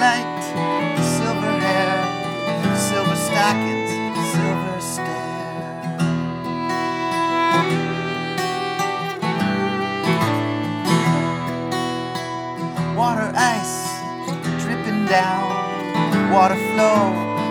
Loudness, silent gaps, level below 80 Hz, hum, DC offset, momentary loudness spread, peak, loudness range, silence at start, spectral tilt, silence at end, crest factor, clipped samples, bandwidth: -21 LUFS; none; -56 dBFS; none; under 0.1%; 8 LU; -2 dBFS; 3 LU; 0 s; -5 dB/octave; 0 s; 18 dB; under 0.1%; 17.5 kHz